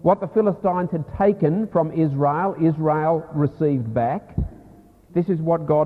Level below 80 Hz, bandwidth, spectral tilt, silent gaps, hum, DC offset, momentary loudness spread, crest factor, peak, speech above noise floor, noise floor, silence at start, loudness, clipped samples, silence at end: -42 dBFS; 4.6 kHz; -11 dB/octave; none; none; under 0.1%; 7 LU; 16 dB; -6 dBFS; 28 dB; -48 dBFS; 0.05 s; -21 LUFS; under 0.1%; 0 s